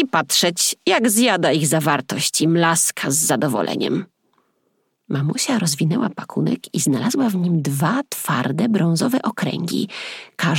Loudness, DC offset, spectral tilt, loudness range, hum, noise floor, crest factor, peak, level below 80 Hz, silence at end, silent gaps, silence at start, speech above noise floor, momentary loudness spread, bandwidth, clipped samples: -19 LUFS; under 0.1%; -4 dB/octave; 5 LU; none; -68 dBFS; 18 dB; -2 dBFS; -70 dBFS; 0 s; none; 0 s; 49 dB; 8 LU; 18.5 kHz; under 0.1%